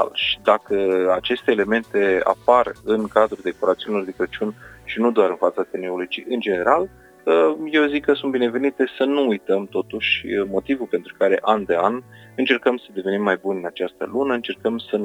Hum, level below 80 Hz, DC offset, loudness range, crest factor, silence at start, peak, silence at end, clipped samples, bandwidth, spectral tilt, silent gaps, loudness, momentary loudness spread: none; -56 dBFS; under 0.1%; 3 LU; 20 dB; 0 s; 0 dBFS; 0 s; under 0.1%; 11.5 kHz; -5.5 dB/octave; none; -21 LUFS; 9 LU